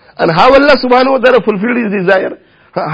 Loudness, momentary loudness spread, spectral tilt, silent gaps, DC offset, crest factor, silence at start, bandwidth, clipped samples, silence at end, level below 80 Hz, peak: -9 LUFS; 11 LU; -6.5 dB/octave; none; under 0.1%; 10 dB; 0.2 s; 8 kHz; 1%; 0 s; -40 dBFS; 0 dBFS